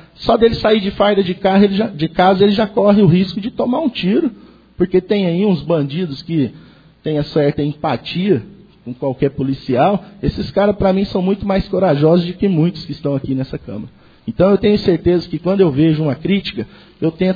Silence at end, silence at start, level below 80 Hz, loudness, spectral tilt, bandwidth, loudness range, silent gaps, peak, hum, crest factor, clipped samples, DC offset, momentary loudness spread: 0 s; 0.2 s; -40 dBFS; -16 LUFS; -9 dB/octave; 5 kHz; 5 LU; none; 0 dBFS; none; 16 dB; under 0.1%; under 0.1%; 10 LU